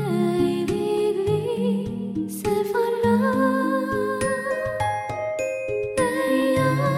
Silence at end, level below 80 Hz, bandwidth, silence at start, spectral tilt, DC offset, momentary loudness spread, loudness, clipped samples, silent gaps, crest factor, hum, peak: 0 s; -52 dBFS; 16 kHz; 0 s; -6 dB/octave; under 0.1%; 6 LU; -23 LUFS; under 0.1%; none; 14 dB; none; -10 dBFS